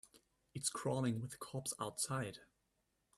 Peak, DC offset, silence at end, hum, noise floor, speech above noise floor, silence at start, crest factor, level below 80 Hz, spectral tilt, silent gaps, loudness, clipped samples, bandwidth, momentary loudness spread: -24 dBFS; under 0.1%; 0.75 s; none; -83 dBFS; 41 dB; 0.05 s; 20 dB; -76 dBFS; -4 dB/octave; none; -41 LUFS; under 0.1%; 14.5 kHz; 9 LU